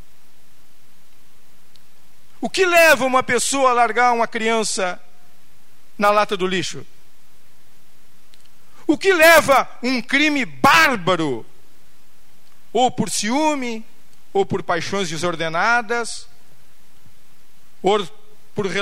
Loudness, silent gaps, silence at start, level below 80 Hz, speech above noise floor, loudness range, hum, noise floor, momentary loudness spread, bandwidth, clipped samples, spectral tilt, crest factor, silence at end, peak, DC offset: -17 LUFS; none; 2.4 s; -54 dBFS; 38 dB; 8 LU; none; -56 dBFS; 16 LU; 16 kHz; under 0.1%; -3 dB/octave; 18 dB; 0 s; -2 dBFS; 4%